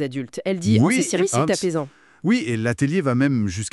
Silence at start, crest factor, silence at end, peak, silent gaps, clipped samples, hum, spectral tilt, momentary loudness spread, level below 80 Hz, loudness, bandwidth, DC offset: 0 s; 16 dB; 0.05 s; -4 dBFS; none; under 0.1%; none; -5.5 dB/octave; 10 LU; -60 dBFS; -21 LUFS; 12 kHz; under 0.1%